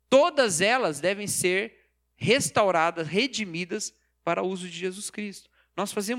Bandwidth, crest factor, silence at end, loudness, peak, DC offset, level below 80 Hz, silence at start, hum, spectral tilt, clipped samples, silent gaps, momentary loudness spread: 16.5 kHz; 20 dB; 0 s; -26 LUFS; -6 dBFS; under 0.1%; -68 dBFS; 0.1 s; none; -3 dB/octave; under 0.1%; none; 13 LU